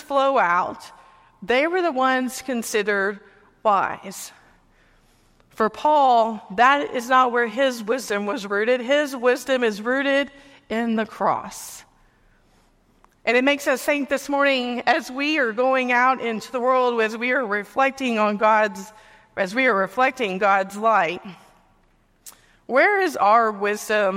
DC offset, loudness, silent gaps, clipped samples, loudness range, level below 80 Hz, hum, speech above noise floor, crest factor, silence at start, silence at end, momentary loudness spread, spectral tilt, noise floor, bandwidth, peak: under 0.1%; -21 LUFS; none; under 0.1%; 5 LU; -64 dBFS; none; 39 dB; 18 dB; 0 s; 0 s; 10 LU; -3.5 dB/octave; -60 dBFS; 16 kHz; -4 dBFS